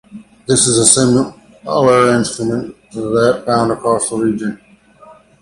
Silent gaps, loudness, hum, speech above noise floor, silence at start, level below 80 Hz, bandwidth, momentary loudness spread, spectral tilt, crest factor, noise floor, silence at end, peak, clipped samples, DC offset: none; -13 LUFS; none; 30 dB; 0.1 s; -48 dBFS; 14.5 kHz; 16 LU; -4 dB/octave; 16 dB; -43 dBFS; 0.3 s; 0 dBFS; under 0.1%; under 0.1%